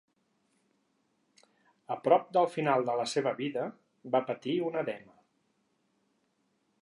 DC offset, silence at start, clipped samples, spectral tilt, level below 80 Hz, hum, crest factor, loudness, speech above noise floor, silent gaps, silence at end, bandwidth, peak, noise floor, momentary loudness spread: under 0.1%; 1.9 s; under 0.1%; -5.5 dB/octave; -86 dBFS; none; 24 dB; -31 LUFS; 46 dB; none; 1.85 s; 11.5 kHz; -10 dBFS; -76 dBFS; 13 LU